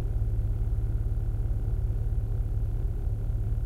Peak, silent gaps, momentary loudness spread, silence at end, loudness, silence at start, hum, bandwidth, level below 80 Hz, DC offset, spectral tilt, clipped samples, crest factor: -18 dBFS; none; 2 LU; 0 s; -31 LUFS; 0 s; none; 2.3 kHz; -28 dBFS; 0.2%; -9.5 dB/octave; under 0.1%; 10 dB